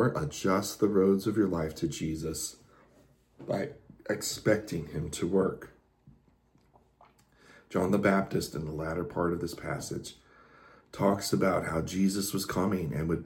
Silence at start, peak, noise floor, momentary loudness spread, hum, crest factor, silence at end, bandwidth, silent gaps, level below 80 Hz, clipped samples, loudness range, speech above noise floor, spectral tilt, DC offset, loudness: 0 s; -12 dBFS; -66 dBFS; 10 LU; none; 20 dB; 0 s; 17 kHz; none; -54 dBFS; under 0.1%; 4 LU; 36 dB; -5.5 dB/octave; under 0.1%; -30 LUFS